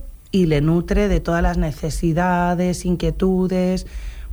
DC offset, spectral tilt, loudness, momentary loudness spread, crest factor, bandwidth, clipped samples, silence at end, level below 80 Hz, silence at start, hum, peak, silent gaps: under 0.1%; -7 dB/octave; -20 LUFS; 6 LU; 14 dB; over 20 kHz; under 0.1%; 0 s; -28 dBFS; 0 s; none; -6 dBFS; none